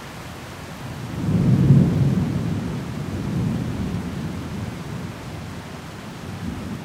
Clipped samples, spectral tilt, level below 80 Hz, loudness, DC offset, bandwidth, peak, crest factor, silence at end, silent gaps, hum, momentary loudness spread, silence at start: under 0.1%; -7.5 dB/octave; -42 dBFS; -23 LUFS; under 0.1%; 15 kHz; -4 dBFS; 20 dB; 0 s; none; none; 19 LU; 0 s